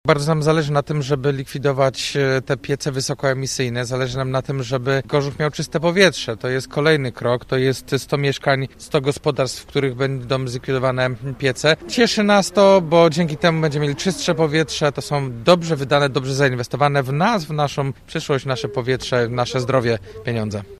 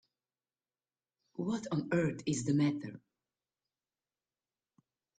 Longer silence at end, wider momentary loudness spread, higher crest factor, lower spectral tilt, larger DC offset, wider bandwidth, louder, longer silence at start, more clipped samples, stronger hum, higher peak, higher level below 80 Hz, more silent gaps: second, 0.05 s vs 2.2 s; second, 8 LU vs 13 LU; about the same, 18 dB vs 18 dB; about the same, -5 dB/octave vs -6 dB/octave; neither; first, 14 kHz vs 9.4 kHz; first, -19 LUFS vs -34 LUFS; second, 0.05 s vs 1.4 s; neither; neither; first, 0 dBFS vs -20 dBFS; first, -48 dBFS vs -72 dBFS; neither